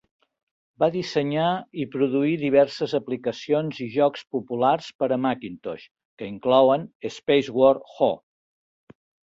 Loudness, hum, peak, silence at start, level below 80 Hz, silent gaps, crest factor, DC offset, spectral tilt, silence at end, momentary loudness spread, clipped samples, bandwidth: -23 LUFS; none; -4 dBFS; 0.8 s; -66 dBFS; 4.95-4.99 s, 5.91-5.95 s, 6.05-6.17 s, 6.95-7.00 s; 20 dB; under 0.1%; -6.5 dB/octave; 1.1 s; 13 LU; under 0.1%; 7.8 kHz